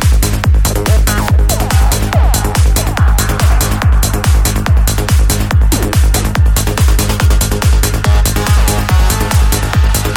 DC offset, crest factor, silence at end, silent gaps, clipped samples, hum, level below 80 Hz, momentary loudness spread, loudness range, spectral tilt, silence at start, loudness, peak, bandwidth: under 0.1%; 10 dB; 0 s; none; under 0.1%; none; -12 dBFS; 1 LU; 0 LU; -4.5 dB/octave; 0 s; -12 LUFS; 0 dBFS; 17 kHz